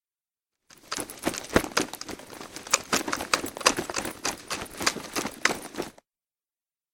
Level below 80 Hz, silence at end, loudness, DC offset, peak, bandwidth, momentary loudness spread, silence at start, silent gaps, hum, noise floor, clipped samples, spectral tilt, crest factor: -54 dBFS; 1 s; -28 LUFS; under 0.1%; 0 dBFS; 17 kHz; 14 LU; 0.85 s; none; none; under -90 dBFS; under 0.1%; -1.5 dB/octave; 30 dB